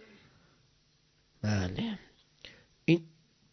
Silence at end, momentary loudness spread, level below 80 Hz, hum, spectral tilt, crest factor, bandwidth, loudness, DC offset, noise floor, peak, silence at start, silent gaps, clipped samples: 0.45 s; 23 LU; -54 dBFS; none; -6.5 dB/octave; 24 dB; 6.4 kHz; -33 LUFS; under 0.1%; -69 dBFS; -12 dBFS; 1.45 s; none; under 0.1%